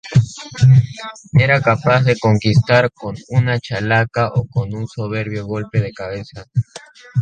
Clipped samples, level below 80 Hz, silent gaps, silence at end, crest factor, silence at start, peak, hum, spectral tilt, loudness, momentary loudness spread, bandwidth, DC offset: under 0.1%; -44 dBFS; none; 0 s; 16 dB; 0.05 s; 0 dBFS; none; -7 dB/octave; -17 LUFS; 14 LU; 8.8 kHz; under 0.1%